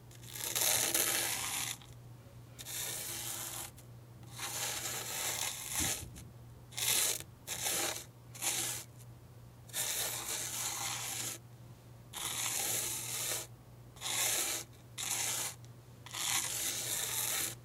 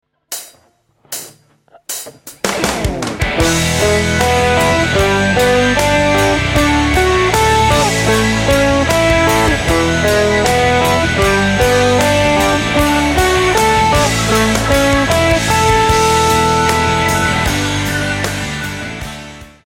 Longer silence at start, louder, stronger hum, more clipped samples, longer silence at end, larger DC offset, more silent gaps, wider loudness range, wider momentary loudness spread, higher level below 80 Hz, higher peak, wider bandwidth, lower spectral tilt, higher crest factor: second, 0 s vs 0.3 s; second, -35 LUFS vs -12 LUFS; neither; neither; second, 0 s vs 0.2 s; neither; neither; about the same, 4 LU vs 4 LU; first, 23 LU vs 12 LU; second, -64 dBFS vs -26 dBFS; second, -14 dBFS vs 0 dBFS; about the same, 17 kHz vs 16.5 kHz; second, -0.5 dB/octave vs -4 dB/octave; first, 26 dB vs 14 dB